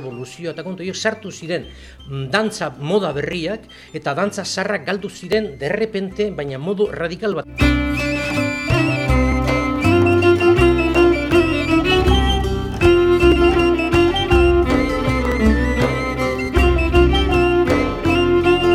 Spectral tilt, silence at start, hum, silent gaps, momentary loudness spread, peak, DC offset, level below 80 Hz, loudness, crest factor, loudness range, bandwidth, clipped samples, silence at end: -6 dB/octave; 0 s; none; none; 12 LU; -2 dBFS; under 0.1%; -26 dBFS; -17 LUFS; 16 dB; 8 LU; 13.5 kHz; under 0.1%; 0 s